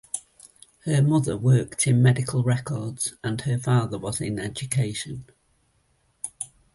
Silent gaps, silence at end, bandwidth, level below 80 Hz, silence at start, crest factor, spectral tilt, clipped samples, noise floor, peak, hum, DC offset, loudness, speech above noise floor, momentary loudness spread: none; 0.3 s; 11.5 kHz; -54 dBFS; 0.15 s; 16 dB; -5.5 dB/octave; under 0.1%; -67 dBFS; -8 dBFS; none; under 0.1%; -24 LUFS; 44 dB; 15 LU